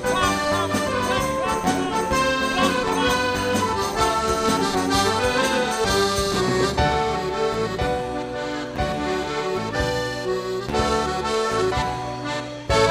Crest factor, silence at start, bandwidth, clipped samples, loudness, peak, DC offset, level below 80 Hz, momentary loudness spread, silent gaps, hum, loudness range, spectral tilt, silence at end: 18 dB; 0 s; 15.5 kHz; under 0.1%; -22 LUFS; -4 dBFS; under 0.1%; -38 dBFS; 6 LU; none; none; 4 LU; -4 dB/octave; 0 s